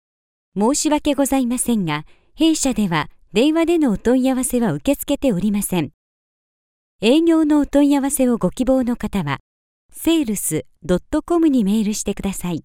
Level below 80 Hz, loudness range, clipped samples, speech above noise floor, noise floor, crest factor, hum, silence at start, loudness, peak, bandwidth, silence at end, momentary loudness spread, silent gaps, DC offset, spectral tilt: -42 dBFS; 2 LU; under 0.1%; over 72 dB; under -90 dBFS; 16 dB; none; 0.55 s; -19 LUFS; -4 dBFS; 17 kHz; 0.05 s; 8 LU; 5.94-6.99 s, 9.40-9.89 s; under 0.1%; -5 dB/octave